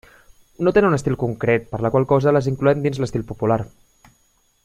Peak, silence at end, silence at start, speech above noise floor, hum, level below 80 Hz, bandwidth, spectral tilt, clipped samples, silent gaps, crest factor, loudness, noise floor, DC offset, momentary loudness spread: -4 dBFS; 1 s; 0.6 s; 43 dB; none; -46 dBFS; 12.5 kHz; -7.5 dB/octave; under 0.1%; none; 18 dB; -20 LUFS; -62 dBFS; under 0.1%; 7 LU